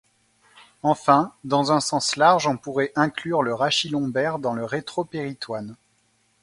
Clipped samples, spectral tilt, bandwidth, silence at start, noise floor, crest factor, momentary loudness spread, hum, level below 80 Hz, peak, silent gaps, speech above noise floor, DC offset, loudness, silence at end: under 0.1%; -4 dB/octave; 11.5 kHz; 0.85 s; -65 dBFS; 22 dB; 12 LU; none; -64 dBFS; -2 dBFS; none; 43 dB; under 0.1%; -22 LUFS; 0.7 s